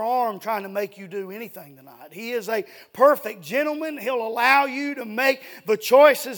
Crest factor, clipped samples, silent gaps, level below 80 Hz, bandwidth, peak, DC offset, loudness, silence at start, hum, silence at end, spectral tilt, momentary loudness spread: 20 dB; under 0.1%; none; -82 dBFS; 19.5 kHz; -2 dBFS; under 0.1%; -22 LUFS; 0 s; none; 0 s; -3.5 dB/octave; 18 LU